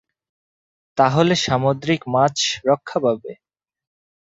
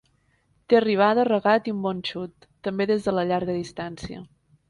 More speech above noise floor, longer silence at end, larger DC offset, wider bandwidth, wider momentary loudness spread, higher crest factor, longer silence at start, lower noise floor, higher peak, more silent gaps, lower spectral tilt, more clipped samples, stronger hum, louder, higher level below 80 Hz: first, over 71 dB vs 43 dB; first, 0.9 s vs 0.45 s; neither; second, 8 kHz vs 11.5 kHz; second, 8 LU vs 16 LU; about the same, 20 dB vs 18 dB; first, 0.95 s vs 0.7 s; first, under -90 dBFS vs -66 dBFS; first, -2 dBFS vs -6 dBFS; neither; second, -4.5 dB/octave vs -6.5 dB/octave; neither; neither; first, -19 LUFS vs -23 LUFS; about the same, -56 dBFS vs -58 dBFS